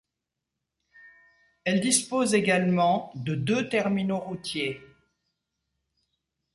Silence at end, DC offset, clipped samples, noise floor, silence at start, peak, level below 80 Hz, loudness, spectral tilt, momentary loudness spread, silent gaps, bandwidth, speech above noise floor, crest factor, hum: 1.7 s; under 0.1%; under 0.1%; -85 dBFS; 1.05 s; -6 dBFS; -66 dBFS; -26 LUFS; -4.5 dB/octave; 10 LU; none; 11.5 kHz; 60 dB; 22 dB; none